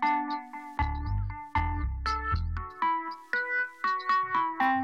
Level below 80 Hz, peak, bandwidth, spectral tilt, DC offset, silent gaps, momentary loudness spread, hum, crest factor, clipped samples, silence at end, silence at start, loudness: -38 dBFS; -14 dBFS; 8 kHz; -6.5 dB/octave; under 0.1%; none; 7 LU; none; 14 dB; under 0.1%; 0 s; 0 s; -30 LUFS